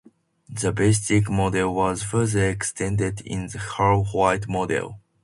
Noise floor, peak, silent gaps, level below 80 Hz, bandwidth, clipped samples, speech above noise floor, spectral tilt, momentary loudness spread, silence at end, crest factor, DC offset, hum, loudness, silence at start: -47 dBFS; -6 dBFS; none; -44 dBFS; 11.5 kHz; under 0.1%; 24 dB; -5.5 dB/octave; 10 LU; 0.25 s; 18 dB; under 0.1%; none; -23 LUFS; 0.5 s